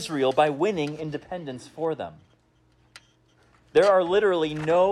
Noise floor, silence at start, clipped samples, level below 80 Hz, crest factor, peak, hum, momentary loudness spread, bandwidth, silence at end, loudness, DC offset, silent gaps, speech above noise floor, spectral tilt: -63 dBFS; 0 s; under 0.1%; -62 dBFS; 16 dB; -8 dBFS; none; 16 LU; 12.5 kHz; 0 s; -24 LUFS; under 0.1%; none; 39 dB; -5.5 dB/octave